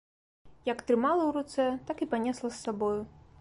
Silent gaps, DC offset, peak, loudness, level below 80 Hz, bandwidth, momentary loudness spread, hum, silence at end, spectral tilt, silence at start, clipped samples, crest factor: none; under 0.1%; -16 dBFS; -31 LUFS; -62 dBFS; 11.5 kHz; 9 LU; none; 0.3 s; -5.5 dB/octave; 0.45 s; under 0.1%; 16 dB